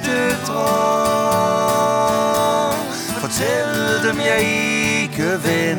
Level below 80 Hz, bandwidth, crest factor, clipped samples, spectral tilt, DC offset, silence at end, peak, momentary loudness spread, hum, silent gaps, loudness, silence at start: -48 dBFS; 19 kHz; 14 dB; under 0.1%; -4 dB/octave; under 0.1%; 0 s; -4 dBFS; 3 LU; none; none; -17 LUFS; 0 s